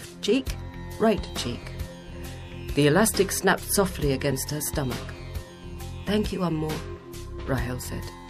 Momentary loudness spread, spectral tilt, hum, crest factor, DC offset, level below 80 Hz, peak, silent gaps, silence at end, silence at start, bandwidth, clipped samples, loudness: 16 LU; -4.5 dB/octave; none; 18 dB; under 0.1%; -40 dBFS; -10 dBFS; none; 0 s; 0 s; 15.5 kHz; under 0.1%; -26 LUFS